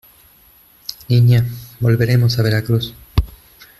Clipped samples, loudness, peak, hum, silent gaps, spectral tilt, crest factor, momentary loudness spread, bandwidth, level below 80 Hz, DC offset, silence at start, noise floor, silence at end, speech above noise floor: under 0.1%; -16 LUFS; -2 dBFS; none; none; -7 dB/octave; 14 dB; 18 LU; 13 kHz; -32 dBFS; under 0.1%; 0.9 s; -49 dBFS; 0.55 s; 35 dB